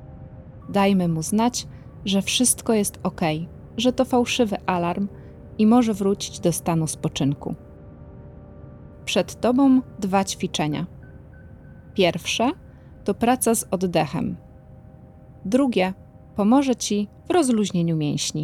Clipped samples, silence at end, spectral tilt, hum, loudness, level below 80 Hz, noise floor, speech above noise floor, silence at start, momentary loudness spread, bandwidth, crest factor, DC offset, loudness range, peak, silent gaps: under 0.1%; 0 s; -4.5 dB/octave; none; -22 LUFS; -50 dBFS; -45 dBFS; 24 dB; 0 s; 19 LU; 16.5 kHz; 18 dB; under 0.1%; 3 LU; -6 dBFS; none